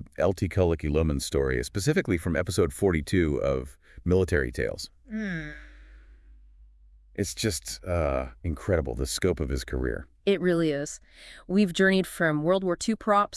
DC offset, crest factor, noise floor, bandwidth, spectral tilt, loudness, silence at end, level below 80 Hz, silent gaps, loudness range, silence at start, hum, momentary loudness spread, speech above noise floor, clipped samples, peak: under 0.1%; 18 dB; -54 dBFS; 12 kHz; -5.5 dB/octave; -27 LUFS; 0 s; -40 dBFS; none; 7 LU; 0 s; none; 11 LU; 28 dB; under 0.1%; -10 dBFS